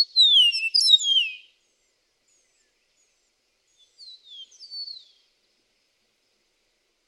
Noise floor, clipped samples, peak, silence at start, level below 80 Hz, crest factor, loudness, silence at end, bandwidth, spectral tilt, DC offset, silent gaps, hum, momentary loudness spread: -71 dBFS; under 0.1%; -6 dBFS; 0 s; -86 dBFS; 22 dB; -16 LUFS; 2.15 s; 14 kHz; 7.5 dB/octave; under 0.1%; none; none; 28 LU